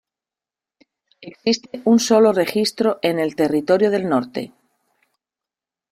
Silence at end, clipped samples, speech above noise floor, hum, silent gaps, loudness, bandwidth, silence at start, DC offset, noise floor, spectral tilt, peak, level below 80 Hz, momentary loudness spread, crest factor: 1.45 s; under 0.1%; 71 dB; none; none; -18 LUFS; 15 kHz; 1.2 s; under 0.1%; -89 dBFS; -4.5 dB/octave; -4 dBFS; -64 dBFS; 10 LU; 16 dB